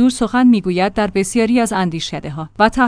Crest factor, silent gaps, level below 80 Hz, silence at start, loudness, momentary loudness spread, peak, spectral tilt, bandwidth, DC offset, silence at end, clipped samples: 14 dB; none; -40 dBFS; 0 s; -16 LUFS; 11 LU; 0 dBFS; -5 dB/octave; 10.5 kHz; under 0.1%; 0 s; under 0.1%